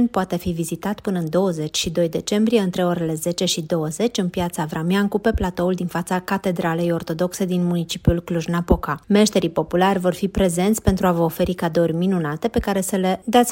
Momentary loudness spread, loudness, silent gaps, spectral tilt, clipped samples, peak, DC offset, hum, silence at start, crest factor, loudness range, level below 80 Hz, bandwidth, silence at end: 6 LU; -21 LUFS; none; -5.5 dB/octave; under 0.1%; -2 dBFS; under 0.1%; none; 0 s; 18 dB; 3 LU; -36 dBFS; 16.5 kHz; 0 s